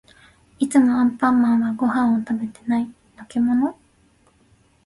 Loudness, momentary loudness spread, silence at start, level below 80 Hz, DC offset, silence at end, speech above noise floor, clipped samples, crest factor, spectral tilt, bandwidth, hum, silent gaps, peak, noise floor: -20 LUFS; 10 LU; 0.6 s; -58 dBFS; under 0.1%; 1.15 s; 39 dB; under 0.1%; 16 dB; -6 dB/octave; 11.5 kHz; none; none; -4 dBFS; -58 dBFS